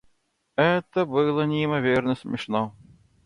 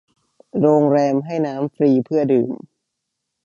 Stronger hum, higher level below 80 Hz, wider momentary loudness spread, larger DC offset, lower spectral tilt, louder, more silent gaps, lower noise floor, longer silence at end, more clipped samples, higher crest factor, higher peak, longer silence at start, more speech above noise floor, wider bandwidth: neither; first, -60 dBFS vs -68 dBFS; second, 7 LU vs 10 LU; neither; second, -7.5 dB/octave vs -9 dB/octave; second, -24 LUFS vs -18 LUFS; neither; second, -68 dBFS vs -78 dBFS; second, 0.55 s vs 0.9 s; neither; about the same, 16 dB vs 16 dB; second, -8 dBFS vs -2 dBFS; about the same, 0.6 s vs 0.55 s; second, 45 dB vs 61 dB; first, 11 kHz vs 7.4 kHz